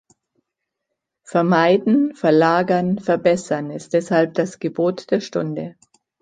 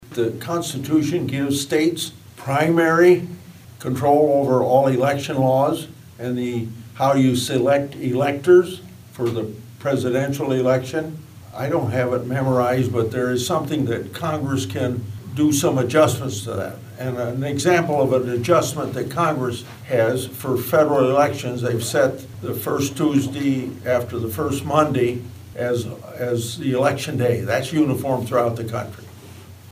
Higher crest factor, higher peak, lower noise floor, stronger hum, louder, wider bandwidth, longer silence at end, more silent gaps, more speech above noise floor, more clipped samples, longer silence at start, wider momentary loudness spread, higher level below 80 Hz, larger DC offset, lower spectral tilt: about the same, 18 dB vs 18 dB; about the same, -2 dBFS vs -2 dBFS; first, -80 dBFS vs -41 dBFS; neither; about the same, -19 LUFS vs -20 LUFS; second, 9.4 kHz vs 16 kHz; first, 0.5 s vs 0.15 s; neither; first, 62 dB vs 21 dB; neither; first, 1.3 s vs 0.05 s; second, 9 LU vs 12 LU; second, -64 dBFS vs -58 dBFS; neither; about the same, -6.5 dB/octave vs -6 dB/octave